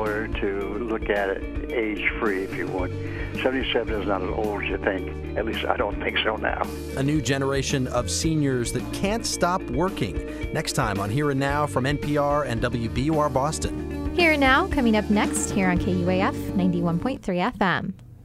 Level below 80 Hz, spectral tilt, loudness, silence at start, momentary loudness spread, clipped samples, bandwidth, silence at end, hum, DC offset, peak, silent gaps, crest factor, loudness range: -36 dBFS; -5 dB/octave; -24 LUFS; 0 s; 7 LU; under 0.1%; 15.5 kHz; 0 s; none; under 0.1%; -6 dBFS; none; 18 dB; 4 LU